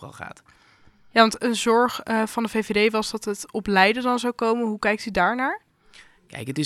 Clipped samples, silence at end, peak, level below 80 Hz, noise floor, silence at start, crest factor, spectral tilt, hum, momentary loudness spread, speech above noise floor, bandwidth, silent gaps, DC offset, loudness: under 0.1%; 0 s; -2 dBFS; -54 dBFS; -52 dBFS; 0 s; 22 dB; -4 dB/octave; none; 16 LU; 29 dB; 14.5 kHz; none; under 0.1%; -22 LUFS